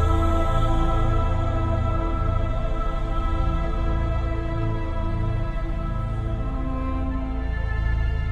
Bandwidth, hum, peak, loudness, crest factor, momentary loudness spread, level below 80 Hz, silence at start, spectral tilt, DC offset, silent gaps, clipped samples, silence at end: 8.4 kHz; none; -8 dBFS; -26 LUFS; 14 dB; 5 LU; -24 dBFS; 0 s; -8 dB/octave; under 0.1%; none; under 0.1%; 0 s